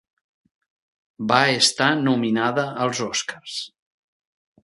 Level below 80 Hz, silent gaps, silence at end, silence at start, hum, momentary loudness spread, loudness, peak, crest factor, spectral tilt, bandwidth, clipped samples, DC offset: -68 dBFS; none; 0.95 s; 1.2 s; none; 14 LU; -21 LUFS; 0 dBFS; 24 dB; -3.5 dB/octave; 11.5 kHz; under 0.1%; under 0.1%